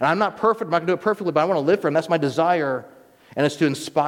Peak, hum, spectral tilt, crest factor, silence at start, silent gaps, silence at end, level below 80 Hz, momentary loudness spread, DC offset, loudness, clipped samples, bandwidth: -6 dBFS; none; -6 dB/octave; 16 dB; 0 s; none; 0 s; -68 dBFS; 4 LU; under 0.1%; -21 LUFS; under 0.1%; 16.5 kHz